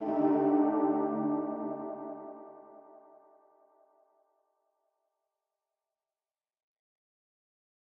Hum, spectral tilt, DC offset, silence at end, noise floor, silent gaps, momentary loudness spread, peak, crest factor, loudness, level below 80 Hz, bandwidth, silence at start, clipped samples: none; -11 dB/octave; under 0.1%; 5 s; under -90 dBFS; none; 22 LU; -16 dBFS; 20 dB; -30 LUFS; -84 dBFS; 3.1 kHz; 0 s; under 0.1%